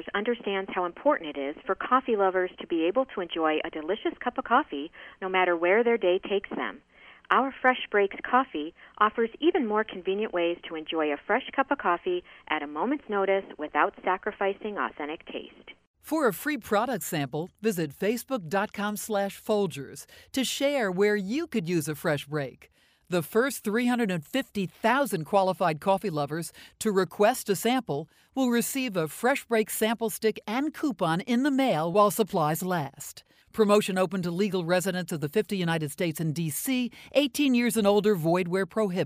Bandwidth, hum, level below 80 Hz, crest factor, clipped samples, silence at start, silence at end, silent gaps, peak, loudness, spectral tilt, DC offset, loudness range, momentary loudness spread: 15.5 kHz; none; -66 dBFS; 20 dB; under 0.1%; 0 s; 0 s; 15.87-15.94 s; -6 dBFS; -27 LUFS; -5 dB/octave; under 0.1%; 4 LU; 9 LU